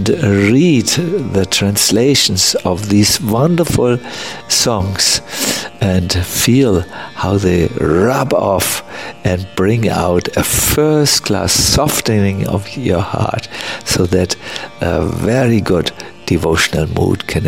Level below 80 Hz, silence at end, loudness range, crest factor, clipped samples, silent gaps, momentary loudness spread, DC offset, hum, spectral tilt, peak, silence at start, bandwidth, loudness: -34 dBFS; 0 s; 4 LU; 14 dB; under 0.1%; none; 8 LU; 0.9%; none; -4 dB/octave; 0 dBFS; 0 s; 16.5 kHz; -13 LUFS